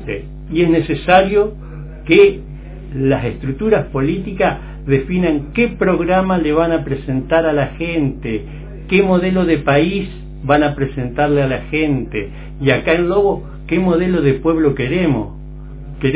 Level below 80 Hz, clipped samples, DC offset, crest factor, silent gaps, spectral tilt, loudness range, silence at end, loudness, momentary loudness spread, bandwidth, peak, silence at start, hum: -32 dBFS; under 0.1%; under 0.1%; 16 dB; none; -11 dB/octave; 2 LU; 0 s; -16 LUFS; 15 LU; 4 kHz; 0 dBFS; 0 s; none